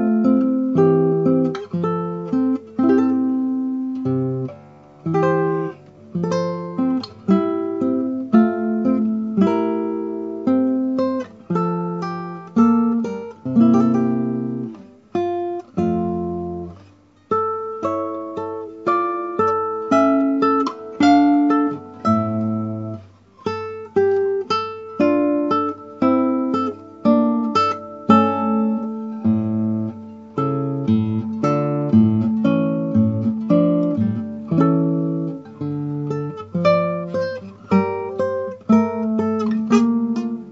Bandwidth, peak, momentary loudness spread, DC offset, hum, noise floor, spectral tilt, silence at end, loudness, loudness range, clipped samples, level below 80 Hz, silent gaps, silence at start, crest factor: 7.6 kHz; 0 dBFS; 11 LU; under 0.1%; none; -50 dBFS; -8.5 dB/octave; 0 s; -20 LUFS; 5 LU; under 0.1%; -62 dBFS; none; 0 s; 18 dB